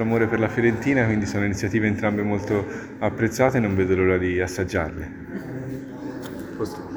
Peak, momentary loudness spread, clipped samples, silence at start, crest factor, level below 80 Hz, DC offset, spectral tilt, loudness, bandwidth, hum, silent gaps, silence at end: -4 dBFS; 13 LU; under 0.1%; 0 s; 20 dB; -46 dBFS; under 0.1%; -7 dB/octave; -23 LUFS; over 20 kHz; none; none; 0 s